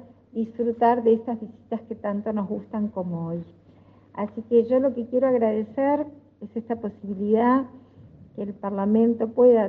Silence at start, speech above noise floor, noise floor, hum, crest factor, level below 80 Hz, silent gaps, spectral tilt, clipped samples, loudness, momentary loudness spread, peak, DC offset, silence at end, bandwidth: 0.35 s; 30 dB; -53 dBFS; none; 16 dB; -68 dBFS; none; -10.5 dB/octave; under 0.1%; -24 LUFS; 15 LU; -8 dBFS; under 0.1%; 0 s; 4.3 kHz